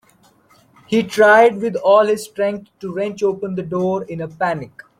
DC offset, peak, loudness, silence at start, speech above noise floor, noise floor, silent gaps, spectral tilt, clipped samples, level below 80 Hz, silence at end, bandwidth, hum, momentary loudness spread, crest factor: under 0.1%; -2 dBFS; -17 LUFS; 0.9 s; 38 dB; -54 dBFS; none; -5.5 dB/octave; under 0.1%; -60 dBFS; 0.35 s; 16 kHz; none; 14 LU; 16 dB